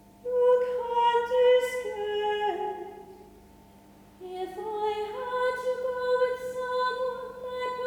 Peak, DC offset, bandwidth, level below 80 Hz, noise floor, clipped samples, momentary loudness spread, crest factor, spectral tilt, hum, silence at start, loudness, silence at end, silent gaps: -14 dBFS; under 0.1%; 15.5 kHz; -64 dBFS; -54 dBFS; under 0.1%; 14 LU; 16 dB; -3.5 dB/octave; 50 Hz at -60 dBFS; 0.25 s; -28 LUFS; 0 s; none